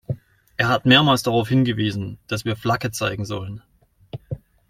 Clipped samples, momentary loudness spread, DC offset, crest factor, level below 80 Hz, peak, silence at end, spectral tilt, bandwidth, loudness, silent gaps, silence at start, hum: under 0.1%; 21 LU; under 0.1%; 20 dB; -52 dBFS; -2 dBFS; 0.35 s; -5 dB/octave; 16 kHz; -20 LUFS; none; 0.1 s; none